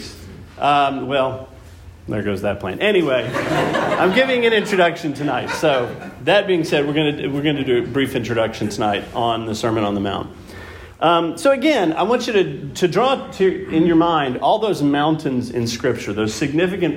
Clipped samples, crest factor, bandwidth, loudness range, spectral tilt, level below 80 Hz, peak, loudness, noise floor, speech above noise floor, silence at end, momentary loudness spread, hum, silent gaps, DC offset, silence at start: under 0.1%; 16 dB; 16.5 kHz; 3 LU; -5.5 dB/octave; -48 dBFS; -4 dBFS; -18 LUFS; -40 dBFS; 22 dB; 0 s; 8 LU; none; none; under 0.1%; 0 s